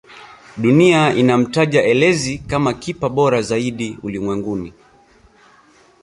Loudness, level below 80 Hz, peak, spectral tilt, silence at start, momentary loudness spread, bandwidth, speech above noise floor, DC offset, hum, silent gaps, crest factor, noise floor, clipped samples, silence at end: -16 LUFS; -48 dBFS; -2 dBFS; -5.5 dB/octave; 0.1 s; 13 LU; 11.5 kHz; 35 dB; under 0.1%; none; none; 16 dB; -50 dBFS; under 0.1%; 1.3 s